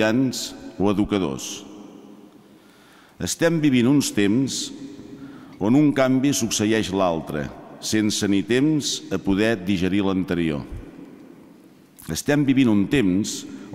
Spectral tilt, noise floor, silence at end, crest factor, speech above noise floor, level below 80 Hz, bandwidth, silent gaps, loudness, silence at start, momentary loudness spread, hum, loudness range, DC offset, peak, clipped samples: -5 dB/octave; -51 dBFS; 0 s; 16 dB; 30 dB; -48 dBFS; 16 kHz; none; -21 LUFS; 0 s; 18 LU; none; 4 LU; under 0.1%; -6 dBFS; under 0.1%